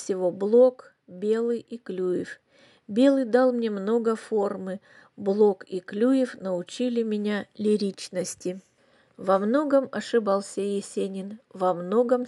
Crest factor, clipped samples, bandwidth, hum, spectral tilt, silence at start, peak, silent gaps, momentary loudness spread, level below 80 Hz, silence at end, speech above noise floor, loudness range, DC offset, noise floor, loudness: 18 dB; under 0.1%; 12 kHz; none; -6 dB/octave; 0 s; -8 dBFS; none; 12 LU; -80 dBFS; 0 s; 37 dB; 3 LU; under 0.1%; -62 dBFS; -25 LUFS